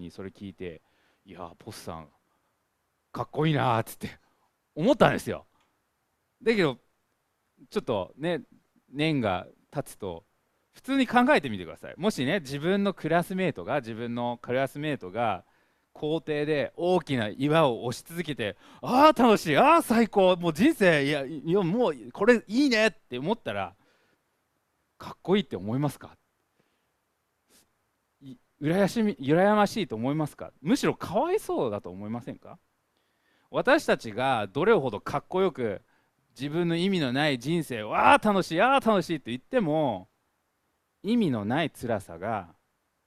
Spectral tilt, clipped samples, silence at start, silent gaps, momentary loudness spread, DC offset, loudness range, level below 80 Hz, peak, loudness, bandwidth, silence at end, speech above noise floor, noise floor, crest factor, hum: -6 dB/octave; under 0.1%; 0 s; none; 17 LU; under 0.1%; 9 LU; -60 dBFS; -4 dBFS; -26 LUFS; 15 kHz; 0.6 s; 50 dB; -76 dBFS; 24 dB; none